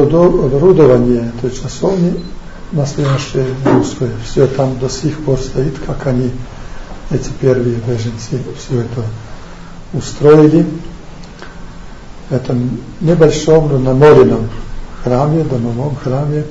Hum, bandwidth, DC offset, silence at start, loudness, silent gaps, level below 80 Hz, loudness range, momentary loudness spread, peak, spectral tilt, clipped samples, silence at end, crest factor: none; 8 kHz; under 0.1%; 0 s; -13 LUFS; none; -28 dBFS; 7 LU; 24 LU; 0 dBFS; -7.5 dB/octave; 0.6%; 0 s; 12 dB